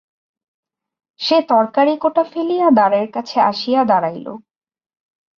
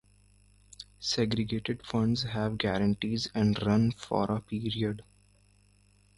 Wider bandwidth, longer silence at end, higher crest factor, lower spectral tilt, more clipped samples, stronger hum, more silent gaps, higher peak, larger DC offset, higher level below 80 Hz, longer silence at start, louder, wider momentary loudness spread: second, 7.2 kHz vs 11.5 kHz; second, 1 s vs 1.15 s; about the same, 16 dB vs 18 dB; about the same, -6 dB/octave vs -6 dB/octave; neither; second, none vs 50 Hz at -45 dBFS; neither; first, -2 dBFS vs -12 dBFS; neither; second, -66 dBFS vs -54 dBFS; first, 1.2 s vs 0.8 s; first, -16 LUFS vs -30 LUFS; first, 10 LU vs 7 LU